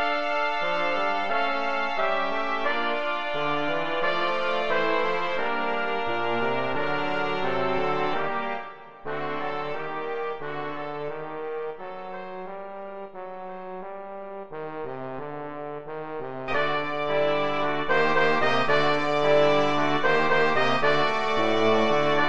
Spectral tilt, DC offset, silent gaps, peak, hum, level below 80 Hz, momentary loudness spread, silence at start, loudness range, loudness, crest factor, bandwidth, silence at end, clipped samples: -5 dB/octave; 2%; none; -10 dBFS; none; -58 dBFS; 15 LU; 0 s; 14 LU; -25 LUFS; 16 dB; 8.8 kHz; 0 s; under 0.1%